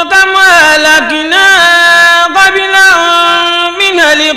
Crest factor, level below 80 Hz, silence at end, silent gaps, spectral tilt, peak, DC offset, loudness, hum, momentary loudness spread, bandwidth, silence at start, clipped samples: 6 dB; -42 dBFS; 0 s; none; 0 dB/octave; 0 dBFS; under 0.1%; -4 LUFS; none; 5 LU; 16.5 kHz; 0 s; 0.3%